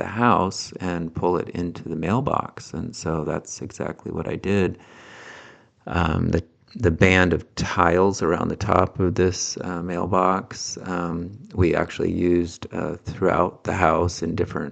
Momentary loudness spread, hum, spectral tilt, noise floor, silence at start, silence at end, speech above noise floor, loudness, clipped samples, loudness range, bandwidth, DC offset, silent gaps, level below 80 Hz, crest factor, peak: 12 LU; none; -5.5 dB/octave; -48 dBFS; 0 s; 0 s; 25 dB; -23 LUFS; under 0.1%; 7 LU; 9 kHz; under 0.1%; none; -44 dBFS; 22 dB; 0 dBFS